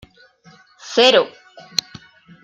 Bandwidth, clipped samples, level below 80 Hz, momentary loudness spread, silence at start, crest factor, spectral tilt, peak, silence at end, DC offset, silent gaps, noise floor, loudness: 15.5 kHz; under 0.1%; -62 dBFS; 11 LU; 0.85 s; 20 dB; -2 dB/octave; -2 dBFS; 1.15 s; under 0.1%; none; -50 dBFS; -17 LUFS